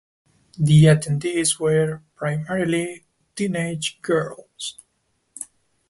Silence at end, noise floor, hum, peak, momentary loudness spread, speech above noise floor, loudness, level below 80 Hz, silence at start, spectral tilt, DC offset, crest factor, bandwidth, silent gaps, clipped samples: 0.45 s; -70 dBFS; none; -2 dBFS; 19 LU; 50 dB; -21 LUFS; -52 dBFS; 0.6 s; -5.5 dB/octave; under 0.1%; 20 dB; 11.5 kHz; none; under 0.1%